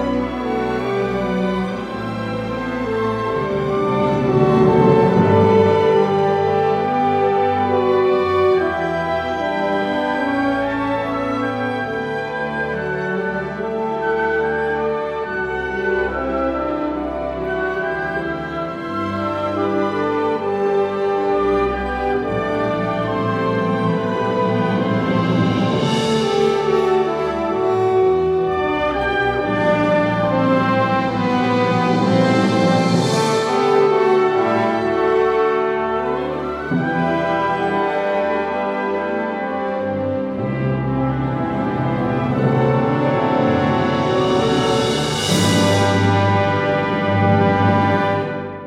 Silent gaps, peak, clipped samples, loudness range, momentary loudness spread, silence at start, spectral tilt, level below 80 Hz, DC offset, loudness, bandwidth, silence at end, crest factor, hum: none; -2 dBFS; under 0.1%; 6 LU; 7 LU; 0 s; -6.5 dB/octave; -44 dBFS; under 0.1%; -18 LUFS; 13.5 kHz; 0 s; 16 dB; none